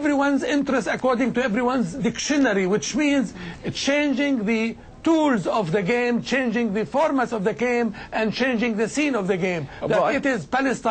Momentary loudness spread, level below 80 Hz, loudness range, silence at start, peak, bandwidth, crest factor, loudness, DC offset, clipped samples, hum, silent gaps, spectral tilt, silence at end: 5 LU; -52 dBFS; 1 LU; 0 s; -10 dBFS; 9 kHz; 12 dB; -22 LUFS; under 0.1%; under 0.1%; none; none; -5 dB/octave; 0 s